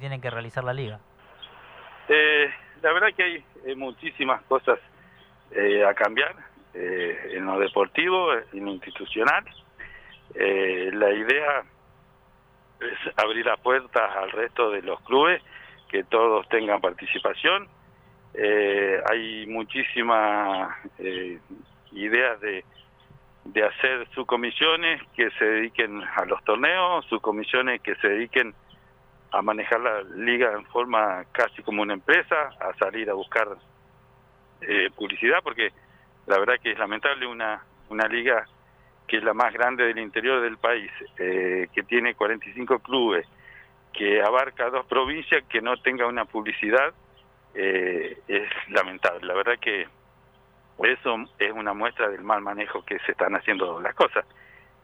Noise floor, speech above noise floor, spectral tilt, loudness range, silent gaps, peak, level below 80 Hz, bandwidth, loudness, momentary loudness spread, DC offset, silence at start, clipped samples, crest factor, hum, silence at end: -57 dBFS; 33 dB; -5.5 dB/octave; 3 LU; none; -6 dBFS; -62 dBFS; 8.6 kHz; -24 LUFS; 11 LU; under 0.1%; 0 s; under 0.1%; 20 dB; none; 0.6 s